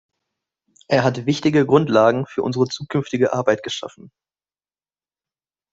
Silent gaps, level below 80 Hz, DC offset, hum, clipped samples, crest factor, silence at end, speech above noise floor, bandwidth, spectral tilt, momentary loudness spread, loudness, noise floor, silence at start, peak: none; -60 dBFS; under 0.1%; none; under 0.1%; 18 dB; 1.65 s; over 71 dB; 8 kHz; -6 dB/octave; 9 LU; -19 LUFS; under -90 dBFS; 0.9 s; -2 dBFS